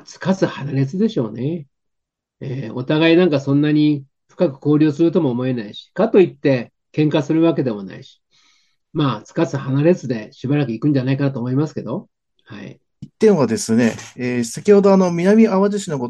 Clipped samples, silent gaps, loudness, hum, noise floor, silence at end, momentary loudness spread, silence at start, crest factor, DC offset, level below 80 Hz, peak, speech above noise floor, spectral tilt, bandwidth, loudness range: under 0.1%; none; -18 LUFS; none; -78 dBFS; 0 s; 14 LU; 0.1 s; 16 dB; under 0.1%; -62 dBFS; -2 dBFS; 61 dB; -7 dB/octave; 12.5 kHz; 4 LU